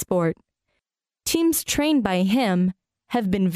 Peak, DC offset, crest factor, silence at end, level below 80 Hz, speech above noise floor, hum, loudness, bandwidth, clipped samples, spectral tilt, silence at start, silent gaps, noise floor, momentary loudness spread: -6 dBFS; under 0.1%; 16 dB; 0 s; -50 dBFS; 60 dB; none; -22 LUFS; 16 kHz; under 0.1%; -5 dB/octave; 0 s; none; -81 dBFS; 7 LU